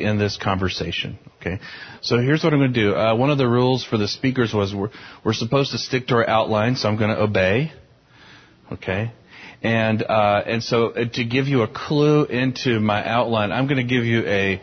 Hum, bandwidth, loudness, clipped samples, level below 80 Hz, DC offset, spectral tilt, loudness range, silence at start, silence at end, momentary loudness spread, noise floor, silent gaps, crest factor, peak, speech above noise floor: none; 6.6 kHz; -20 LUFS; under 0.1%; -46 dBFS; under 0.1%; -6.5 dB/octave; 3 LU; 0 s; 0 s; 10 LU; -50 dBFS; none; 16 dB; -4 dBFS; 30 dB